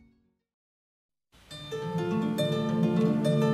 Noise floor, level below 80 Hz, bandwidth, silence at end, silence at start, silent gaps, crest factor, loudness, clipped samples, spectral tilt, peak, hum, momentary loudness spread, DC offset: -67 dBFS; -64 dBFS; 14 kHz; 0 s; 1.5 s; none; 16 dB; -28 LUFS; under 0.1%; -7.5 dB/octave; -12 dBFS; none; 14 LU; under 0.1%